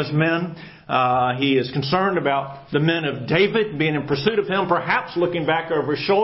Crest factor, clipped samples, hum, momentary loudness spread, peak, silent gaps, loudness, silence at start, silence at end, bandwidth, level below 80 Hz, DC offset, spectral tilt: 16 dB; under 0.1%; none; 5 LU; -4 dBFS; none; -21 LUFS; 0 s; 0 s; 5.8 kHz; -56 dBFS; under 0.1%; -10 dB/octave